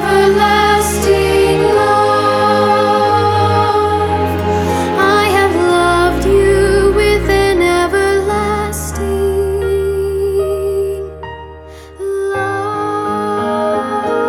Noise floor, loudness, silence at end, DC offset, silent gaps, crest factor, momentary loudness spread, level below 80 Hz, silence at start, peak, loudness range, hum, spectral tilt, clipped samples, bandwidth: -33 dBFS; -13 LUFS; 0 s; under 0.1%; none; 12 dB; 7 LU; -30 dBFS; 0 s; 0 dBFS; 7 LU; none; -5 dB/octave; under 0.1%; 18 kHz